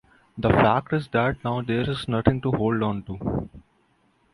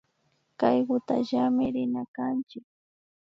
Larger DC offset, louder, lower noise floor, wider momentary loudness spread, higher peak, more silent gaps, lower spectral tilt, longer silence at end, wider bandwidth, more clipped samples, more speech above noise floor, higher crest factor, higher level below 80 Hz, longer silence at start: neither; first, -24 LUFS vs -27 LUFS; second, -64 dBFS vs -72 dBFS; about the same, 10 LU vs 8 LU; first, -4 dBFS vs -10 dBFS; second, none vs 2.08-2.14 s; about the same, -8.5 dB/octave vs -7.5 dB/octave; about the same, 0.75 s vs 0.75 s; first, 11.5 kHz vs 6.4 kHz; neither; second, 41 dB vs 45 dB; about the same, 20 dB vs 20 dB; first, -44 dBFS vs -68 dBFS; second, 0.35 s vs 0.6 s